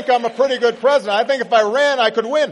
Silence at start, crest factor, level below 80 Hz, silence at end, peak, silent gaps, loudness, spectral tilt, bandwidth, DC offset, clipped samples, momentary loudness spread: 0 s; 14 dB; -70 dBFS; 0 s; -2 dBFS; none; -16 LUFS; -3 dB/octave; 11 kHz; under 0.1%; under 0.1%; 3 LU